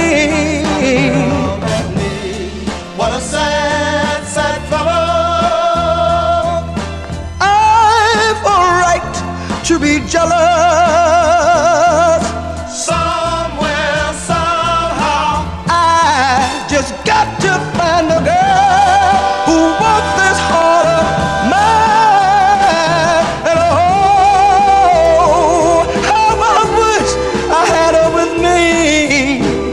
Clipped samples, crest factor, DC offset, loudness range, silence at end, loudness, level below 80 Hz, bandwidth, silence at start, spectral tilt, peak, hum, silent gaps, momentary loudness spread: under 0.1%; 12 dB; under 0.1%; 5 LU; 0 s; -12 LUFS; -30 dBFS; 12.5 kHz; 0 s; -4 dB/octave; 0 dBFS; none; none; 8 LU